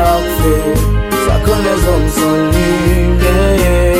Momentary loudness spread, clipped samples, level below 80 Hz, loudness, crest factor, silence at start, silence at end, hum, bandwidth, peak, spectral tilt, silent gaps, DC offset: 3 LU; under 0.1%; -16 dBFS; -12 LUFS; 10 dB; 0 s; 0 s; none; 16.5 kHz; 0 dBFS; -5.5 dB/octave; none; under 0.1%